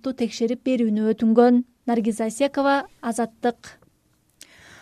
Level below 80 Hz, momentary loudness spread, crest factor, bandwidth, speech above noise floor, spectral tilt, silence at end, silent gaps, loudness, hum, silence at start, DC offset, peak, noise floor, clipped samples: -64 dBFS; 10 LU; 18 dB; 13 kHz; 43 dB; -5.5 dB/octave; 1.1 s; none; -22 LUFS; none; 0.05 s; under 0.1%; -4 dBFS; -64 dBFS; under 0.1%